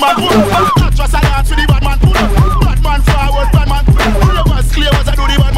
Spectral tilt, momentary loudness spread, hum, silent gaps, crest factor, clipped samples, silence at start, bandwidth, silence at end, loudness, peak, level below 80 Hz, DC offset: -5.5 dB/octave; 3 LU; none; none; 8 dB; 0.6%; 0 s; 15.5 kHz; 0 s; -11 LUFS; 0 dBFS; -12 dBFS; under 0.1%